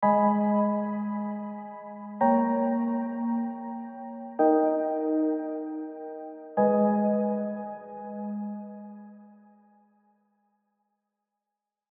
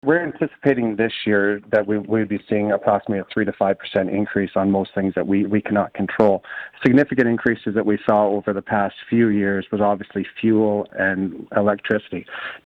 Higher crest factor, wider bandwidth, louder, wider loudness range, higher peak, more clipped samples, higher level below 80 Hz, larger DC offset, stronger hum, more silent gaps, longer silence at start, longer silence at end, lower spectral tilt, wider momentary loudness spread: about the same, 18 dB vs 16 dB; second, 3.2 kHz vs 5.4 kHz; second, -27 LUFS vs -20 LUFS; first, 14 LU vs 2 LU; second, -10 dBFS vs -4 dBFS; neither; second, -86 dBFS vs -56 dBFS; neither; neither; neither; about the same, 0 s vs 0.05 s; first, 2.6 s vs 0.1 s; about the same, -9.5 dB/octave vs -9 dB/octave; first, 17 LU vs 6 LU